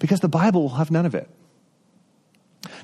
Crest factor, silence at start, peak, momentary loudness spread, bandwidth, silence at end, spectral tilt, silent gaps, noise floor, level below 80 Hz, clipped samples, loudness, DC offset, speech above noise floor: 16 dB; 0 s; -6 dBFS; 19 LU; 13 kHz; 0 s; -7.5 dB/octave; none; -61 dBFS; -66 dBFS; under 0.1%; -21 LUFS; under 0.1%; 40 dB